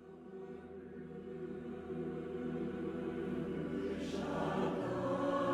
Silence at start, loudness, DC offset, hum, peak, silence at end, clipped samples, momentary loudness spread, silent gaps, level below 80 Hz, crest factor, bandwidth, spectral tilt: 0 s; -41 LUFS; under 0.1%; none; -24 dBFS; 0 s; under 0.1%; 13 LU; none; -64 dBFS; 16 dB; 12.5 kHz; -7 dB/octave